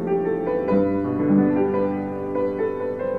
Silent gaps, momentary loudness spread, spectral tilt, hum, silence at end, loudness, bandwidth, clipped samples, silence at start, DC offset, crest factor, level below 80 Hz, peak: none; 7 LU; -10.5 dB/octave; none; 0 s; -22 LUFS; 4.9 kHz; under 0.1%; 0 s; 0.3%; 14 dB; -52 dBFS; -8 dBFS